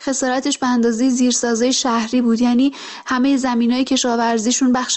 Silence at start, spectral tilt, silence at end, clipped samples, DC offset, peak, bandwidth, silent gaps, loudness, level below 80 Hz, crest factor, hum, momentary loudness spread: 0 s; -2.5 dB/octave; 0 s; under 0.1%; under 0.1%; -6 dBFS; 8.6 kHz; none; -17 LUFS; -56 dBFS; 10 dB; none; 3 LU